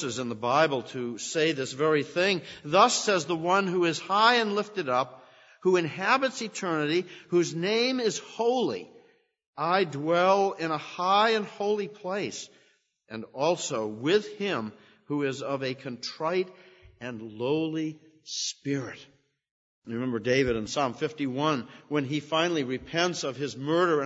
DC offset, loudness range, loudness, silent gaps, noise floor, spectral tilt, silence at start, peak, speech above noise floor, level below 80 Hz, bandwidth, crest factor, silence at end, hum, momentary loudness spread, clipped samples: under 0.1%; 8 LU; -27 LUFS; 9.47-9.53 s, 19.51-19.82 s; -66 dBFS; -4 dB/octave; 0 s; -6 dBFS; 39 dB; -64 dBFS; 8 kHz; 22 dB; 0 s; none; 12 LU; under 0.1%